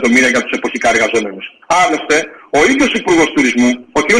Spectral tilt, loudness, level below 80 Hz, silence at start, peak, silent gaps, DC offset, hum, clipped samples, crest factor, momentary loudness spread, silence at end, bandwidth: -3 dB/octave; -12 LUFS; -44 dBFS; 0 s; 0 dBFS; none; under 0.1%; none; under 0.1%; 12 dB; 7 LU; 0 s; 13.5 kHz